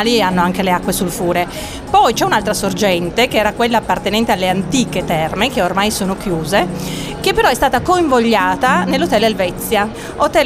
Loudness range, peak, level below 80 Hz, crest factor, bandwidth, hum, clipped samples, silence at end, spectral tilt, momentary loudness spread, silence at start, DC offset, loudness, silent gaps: 2 LU; -2 dBFS; -36 dBFS; 14 dB; 16 kHz; none; under 0.1%; 0 s; -4 dB/octave; 6 LU; 0 s; under 0.1%; -15 LUFS; none